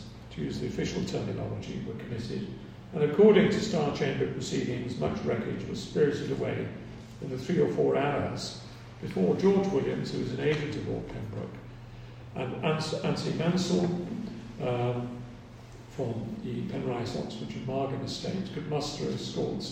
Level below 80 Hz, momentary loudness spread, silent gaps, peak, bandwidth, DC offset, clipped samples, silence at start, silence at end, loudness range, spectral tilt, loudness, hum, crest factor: -54 dBFS; 15 LU; none; -8 dBFS; 10 kHz; under 0.1%; under 0.1%; 0 s; 0 s; 7 LU; -6.5 dB/octave; -30 LUFS; none; 22 dB